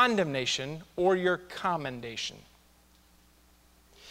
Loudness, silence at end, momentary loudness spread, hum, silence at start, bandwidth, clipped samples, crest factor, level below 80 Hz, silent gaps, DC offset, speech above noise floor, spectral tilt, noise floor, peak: -30 LUFS; 0 s; 11 LU; none; 0 s; 16 kHz; under 0.1%; 22 dB; -64 dBFS; none; under 0.1%; 31 dB; -4 dB/octave; -61 dBFS; -10 dBFS